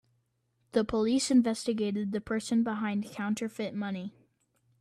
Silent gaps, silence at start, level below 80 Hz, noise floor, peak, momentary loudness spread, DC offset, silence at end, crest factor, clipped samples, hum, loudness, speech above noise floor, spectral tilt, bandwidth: none; 0.75 s; -62 dBFS; -75 dBFS; -14 dBFS; 10 LU; under 0.1%; 0.7 s; 16 dB; under 0.1%; none; -30 LUFS; 46 dB; -5 dB/octave; 13 kHz